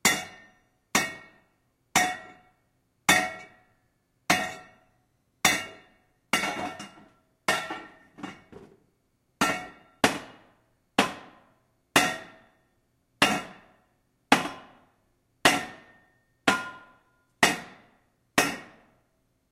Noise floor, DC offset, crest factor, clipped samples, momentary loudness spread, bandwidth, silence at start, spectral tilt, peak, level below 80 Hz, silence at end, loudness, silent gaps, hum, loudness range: -72 dBFS; under 0.1%; 28 dB; under 0.1%; 20 LU; 16 kHz; 0.05 s; -2 dB/octave; -2 dBFS; -64 dBFS; 0.85 s; -26 LUFS; none; none; 5 LU